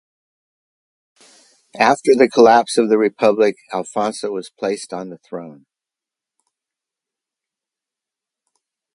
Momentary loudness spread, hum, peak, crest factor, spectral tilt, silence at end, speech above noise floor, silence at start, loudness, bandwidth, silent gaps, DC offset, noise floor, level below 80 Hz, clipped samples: 19 LU; none; 0 dBFS; 20 dB; -4.5 dB/octave; 3.45 s; 71 dB; 1.75 s; -16 LUFS; 11.5 kHz; none; under 0.1%; -87 dBFS; -66 dBFS; under 0.1%